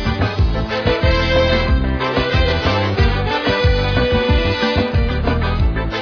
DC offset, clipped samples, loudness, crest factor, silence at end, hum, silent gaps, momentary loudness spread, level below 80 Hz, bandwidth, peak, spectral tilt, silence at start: under 0.1%; under 0.1%; -17 LUFS; 14 dB; 0 s; none; none; 4 LU; -20 dBFS; 5.4 kHz; -2 dBFS; -7 dB/octave; 0 s